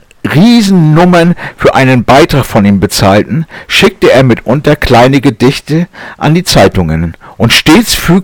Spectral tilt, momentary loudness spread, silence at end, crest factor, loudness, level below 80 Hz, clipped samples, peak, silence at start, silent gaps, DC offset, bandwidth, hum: -5.5 dB/octave; 8 LU; 0 s; 6 dB; -7 LUFS; -26 dBFS; 1%; 0 dBFS; 0.25 s; none; under 0.1%; 19 kHz; none